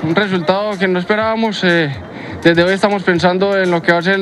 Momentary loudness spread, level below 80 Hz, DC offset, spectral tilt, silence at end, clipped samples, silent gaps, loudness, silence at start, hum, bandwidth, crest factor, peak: 4 LU; -52 dBFS; under 0.1%; -6 dB/octave; 0 s; under 0.1%; none; -14 LUFS; 0 s; none; 11.5 kHz; 14 dB; 0 dBFS